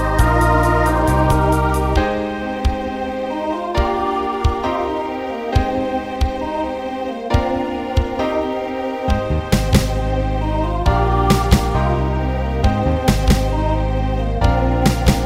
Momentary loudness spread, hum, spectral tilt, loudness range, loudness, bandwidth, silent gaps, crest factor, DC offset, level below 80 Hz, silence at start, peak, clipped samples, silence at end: 7 LU; none; -6.5 dB/octave; 4 LU; -18 LUFS; 16 kHz; none; 16 dB; under 0.1%; -22 dBFS; 0 s; 0 dBFS; under 0.1%; 0 s